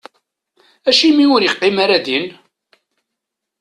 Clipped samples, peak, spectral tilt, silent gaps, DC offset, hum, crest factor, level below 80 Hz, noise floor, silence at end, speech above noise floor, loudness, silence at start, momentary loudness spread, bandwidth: under 0.1%; 0 dBFS; -3.5 dB/octave; none; under 0.1%; none; 16 dB; -62 dBFS; -79 dBFS; 1.3 s; 66 dB; -13 LUFS; 0.85 s; 10 LU; 10.5 kHz